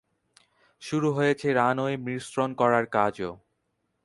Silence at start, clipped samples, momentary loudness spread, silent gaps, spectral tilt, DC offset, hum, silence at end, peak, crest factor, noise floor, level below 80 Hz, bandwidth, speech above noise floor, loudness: 0.8 s; under 0.1%; 10 LU; none; -6 dB/octave; under 0.1%; none; 0.7 s; -6 dBFS; 20 dB; -76 dBFS; -64 dBFS; 11.5 kHz; 51 dB; -26 LUFS